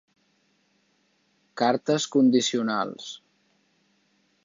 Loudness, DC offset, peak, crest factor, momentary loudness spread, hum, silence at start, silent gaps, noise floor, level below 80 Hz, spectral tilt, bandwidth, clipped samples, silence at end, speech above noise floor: -24 LUFS; under 0.1%; -8 dBFS; 20 dB; 20 LU; none; 1.55 s; none; -68 dBFS; -78 dBFS; -4 dB/octave; 7.6 kHz; under 0.1%; 1.3 s; 45 dB